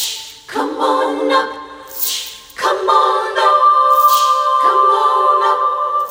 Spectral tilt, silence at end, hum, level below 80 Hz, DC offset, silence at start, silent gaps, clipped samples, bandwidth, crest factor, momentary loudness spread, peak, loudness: -0.5 dB/octave; 0 s; none; -60 dBFS; under 0.1%; 0 s; none; under 0.1%; 18 kHz; 14 dB; 13 LU; 0 dBFS; -13 LUFS